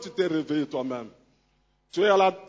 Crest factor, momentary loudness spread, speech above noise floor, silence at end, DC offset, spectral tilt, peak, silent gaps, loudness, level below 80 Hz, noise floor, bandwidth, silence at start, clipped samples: 18 dB; 15 LU; 43 dB; 0.05 s; under 0.1%; -5.5 dB/octave; -8 dBFS; none; -26 LUFS; -70 dBFS; -68 dBFS; 7.8 kHz; 0 s; under 0.1%